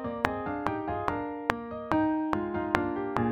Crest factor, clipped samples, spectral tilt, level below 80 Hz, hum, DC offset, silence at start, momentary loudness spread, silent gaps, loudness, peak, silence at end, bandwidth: 28 dB; under 0.1%; -7 dB/octave; -52 dBFS; none; under 0.1%; 0 s; 4 LU; none; -31 LUFS; -2 dBFS; 0 s; 13.5 kHz